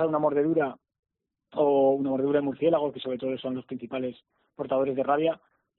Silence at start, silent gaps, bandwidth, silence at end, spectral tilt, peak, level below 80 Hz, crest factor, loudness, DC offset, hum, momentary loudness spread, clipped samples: 0 s; 0.99-1.03 s; 4.2 kHz; 0.4 s; -5.5 dB/octave; -12 dBFS; -70 dBFS; 16 dB; -27 LUFS; under 0.1%; none; 12 LU; under 0.1%